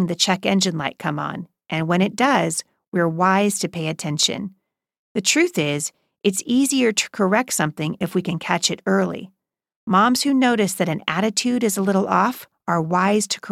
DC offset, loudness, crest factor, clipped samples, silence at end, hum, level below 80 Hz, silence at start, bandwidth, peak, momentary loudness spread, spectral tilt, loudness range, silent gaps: under 0.1%; -20 LUFS; 18 dB; under 0.1%; 0 s; none; -64 dBFS; 0 s; 16 kHz; -2 dBFS; 9 LU; -4 dB/octave; 2 LU; 2.88-2.92 s, 4.99-5.15 s, 9.76-9.87 s